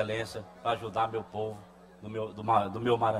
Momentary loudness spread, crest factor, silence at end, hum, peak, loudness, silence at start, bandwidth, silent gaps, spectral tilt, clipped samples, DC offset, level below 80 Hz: 12 LU; 20 dB; 0 s; none; -12 dBFS; -32 LUFS; 0 s; 14.5 kHz; none; -6 dB/octave; under 0.1%; under 0.1%; -62 dBFS